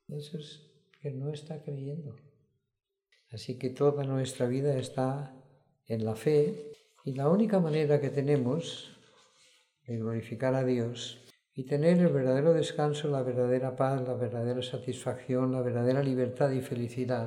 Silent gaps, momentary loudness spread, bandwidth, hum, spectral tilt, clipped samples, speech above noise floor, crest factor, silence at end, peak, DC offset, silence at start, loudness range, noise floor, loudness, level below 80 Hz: none; 16 LU; 12.5 kHz; none; -7 dB/octave; under 0.1%; 42 dB; 18 dB; 0 s; -14 dBFS; under 0.1%; 0.1 s; 7 LU; -72 dBFS; -30 LUFS; -74 dBFS